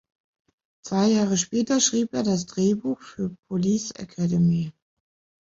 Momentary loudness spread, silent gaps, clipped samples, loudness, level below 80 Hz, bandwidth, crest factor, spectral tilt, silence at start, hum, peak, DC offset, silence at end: 12 LU; 3.39-3.43 s; under 0.1%; -24 LUFS; -60 dBFS; 7.8 kHz; 16 dB; -5 dB/octave; 0.85 s; none; -8 dBFS; under 0.1%; 0.7 s